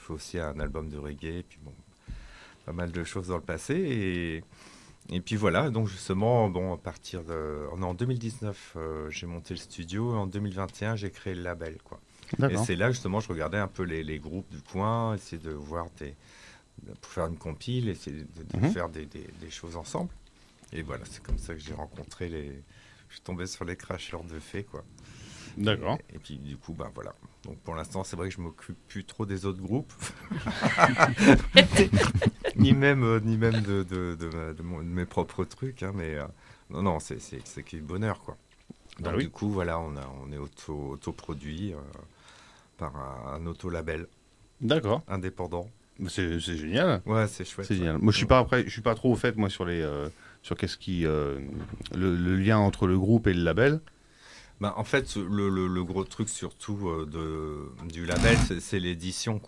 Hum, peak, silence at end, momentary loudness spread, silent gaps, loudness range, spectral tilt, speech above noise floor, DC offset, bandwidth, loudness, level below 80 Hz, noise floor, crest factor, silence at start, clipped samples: none; 0 dBFS; 0 s; 18 LU; none; 15 LU; -5.5 dB/octave; 27 dB; under 0.1%; 12 kHz; -29 LUFS; -46 dBFS; -56 dBFS; 30 dB; 0 s; under 0.1%